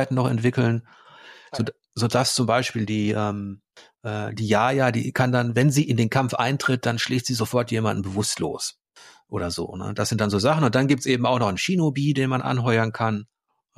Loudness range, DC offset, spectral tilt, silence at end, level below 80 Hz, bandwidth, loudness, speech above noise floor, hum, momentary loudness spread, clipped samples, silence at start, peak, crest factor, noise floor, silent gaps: 4 LU; under 0.1%; -5.5 dB/octave; 0.55 s; -58 dBFS; 15 kHz; -23 LUFS; 29 dB; none; 10 LU; under 0.1%; 0 s; -6 dBFS; 16 dB; -51 dBFS; none